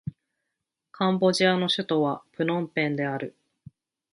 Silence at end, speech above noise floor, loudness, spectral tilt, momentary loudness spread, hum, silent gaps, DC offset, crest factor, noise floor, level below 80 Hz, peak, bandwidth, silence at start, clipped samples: 0.85 s; 59 dB; -25 LUFS; -5.5 dB/octave; 11 LU; none; none; under 0.1%; 20 dB; -84 dBFS; -68 dBFS; -8 dBFS; 11.5 kHz; 0.05 s; under 0.1%